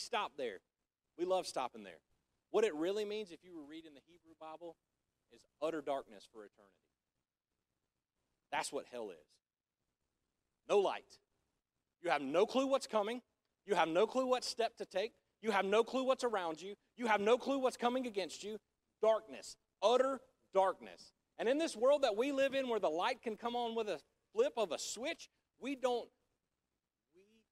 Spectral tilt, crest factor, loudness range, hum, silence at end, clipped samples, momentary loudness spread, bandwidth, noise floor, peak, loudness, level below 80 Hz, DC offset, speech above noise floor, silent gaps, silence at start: -3.5 dB/octave; 22 dB; 12 LU; none; 1.45 s; under 0.1%; 18 LU; 14 kHz; under -90 dBFS; -18 dBFS; -37 LUFS; -82 dBFS; under 0.1%; over 53 dB; none; 0 s